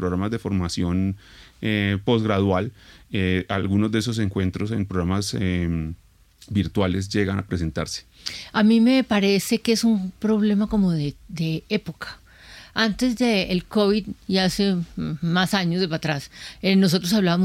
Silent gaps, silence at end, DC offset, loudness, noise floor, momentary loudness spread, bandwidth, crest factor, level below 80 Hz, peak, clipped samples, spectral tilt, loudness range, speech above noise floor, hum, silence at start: none; 0 s; under 0.1%; -23 LUFS; -46 dBFS; 10 LU; 16 kHz; 16 dB; -46 dBFS; -6 dBFS; under 0.1%; -5.5 dB/octave; 5 LU; 24 dB; none; 0 s